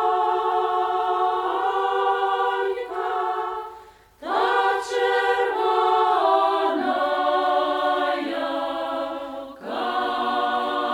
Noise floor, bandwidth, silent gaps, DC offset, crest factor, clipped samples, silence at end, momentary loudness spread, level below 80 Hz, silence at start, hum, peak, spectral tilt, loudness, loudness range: -46 dBFS; 16.5 kHz; none; under 0.1%; 14 dB; under 0.1%; 0 s; 9 LU; -62 dBFS; 0 s; none; -8 dBFS; -3 dB/octave; -23 LUFS; 4 LU